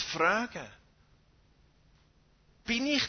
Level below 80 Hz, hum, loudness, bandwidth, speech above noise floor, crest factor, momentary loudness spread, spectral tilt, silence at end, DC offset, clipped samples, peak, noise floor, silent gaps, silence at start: -62 dBFS; none; -30 LUFS; 6.6 kHz; 35 dB; 22 dB; 18 LU; -3 dB/octave; 0 s; under 0.1%; under 0.1%; -12 dBFS; -65 dBFS; none; 0 s